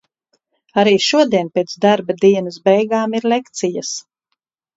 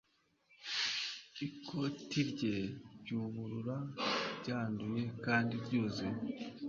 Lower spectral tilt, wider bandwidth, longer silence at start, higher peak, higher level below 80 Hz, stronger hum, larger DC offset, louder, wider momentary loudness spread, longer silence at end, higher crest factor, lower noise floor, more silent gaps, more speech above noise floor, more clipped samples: about the same, -4.5 dB/octave vs -4 dB/octave; about the same, 8 kHz vs 7.4 kHz; first, 0.75 s vs 0.5 s; first, 0 dBFS vs -20 dBFS; about the same, -66 dBFS vs -70 dBFS; neither; neither; first, -16 LUFS vs -38 LUFS; about the same, 9 LU vs 9 LU; first, 0.75 s vs 0 s; about the same, 16 dB vs 20 dB; about the same, -75 dBFS vs -73 dBFS; neither; first, 59 dB vs 35 dB; neither